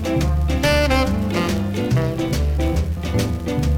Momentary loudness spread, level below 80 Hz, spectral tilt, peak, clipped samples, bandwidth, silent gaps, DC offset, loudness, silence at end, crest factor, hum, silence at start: 5 LU; -24 dBFS; -6 dB/octave; -4 dBFS; under 0.1%; 16.5 kHz; none; under 0.1%; -20 LUFS; 0 s; 14 dB; none; 0 s